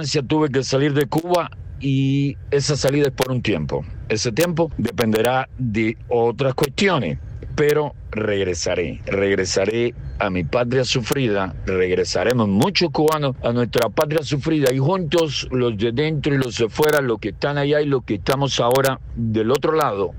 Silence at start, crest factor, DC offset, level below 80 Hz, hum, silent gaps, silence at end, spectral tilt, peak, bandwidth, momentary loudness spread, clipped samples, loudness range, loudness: 0 s; 16 dB; under 0.1%; -40 dBFS; none; none; 0 s; -5.5 dB/octave; -4 dBFS; 16.5 kHz; 5 LU; under 0.1%; 2 LU; -20 LUFS